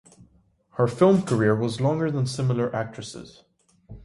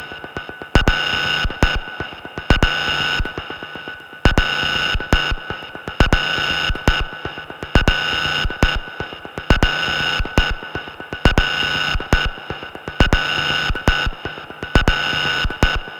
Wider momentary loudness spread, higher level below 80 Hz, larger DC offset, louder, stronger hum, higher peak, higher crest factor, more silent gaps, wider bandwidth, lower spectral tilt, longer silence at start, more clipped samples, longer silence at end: first, 18 LU vs 13 LU; second, -56 dBFS vs -24 dBFS; neither; second, -23 LUFS vs -19 LUFS; neither; second, -6 dBFS vs -2 dBFS; about the same, 18 dB vs 18 dB; neither; second, 11.5 kHz vs 17 kHz; first, -7 dB/octave vs -4.5 dB/octave; first, 0.75 s vs 0 s; neither; about the same, 0.05 s vs 0 s